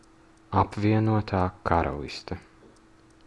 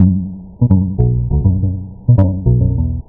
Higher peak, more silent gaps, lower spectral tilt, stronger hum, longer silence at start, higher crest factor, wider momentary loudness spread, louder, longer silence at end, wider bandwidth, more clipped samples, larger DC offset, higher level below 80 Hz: second, -6 dBFS vs 0 dBFS; neither; second, -8 dB/octave vs -14.5 dB/octave; neither; first, 0.5 s vs 0 s; first, 22 dB vs 14 dB; first, 13 LU vs 8 LU; second, -26 LUFS vs -15 LUFS; first, 0.9 s vs 0.05 s; first, 10.5 kHz vs 1.8 kHz; second, under 0.1% vs 0.1%; neither; second, -48 dBFS vs -24 dBFS